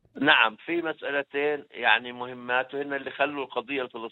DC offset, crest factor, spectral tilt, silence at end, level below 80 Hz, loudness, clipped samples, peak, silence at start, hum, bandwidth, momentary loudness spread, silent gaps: under 0.1%; 22 dB; -6 dB/octave; 0 s; -76 dBFS; -26 LUFS; under 0.1%; -4 dBFS; 0.15 s; none; 16 kHz; 12 LU; none